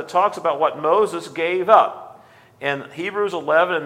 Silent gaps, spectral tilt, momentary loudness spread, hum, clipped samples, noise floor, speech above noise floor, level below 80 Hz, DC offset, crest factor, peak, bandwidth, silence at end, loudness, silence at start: none; -4.5 dB/octave; 11 LU; none; under 0.1%; -47 dBFS; 28 dB; -74 dBFS; under 0.1%; 20 dB; 0 dBFS; 13.5 kHz; 0 s; -19 LUFS; 0 s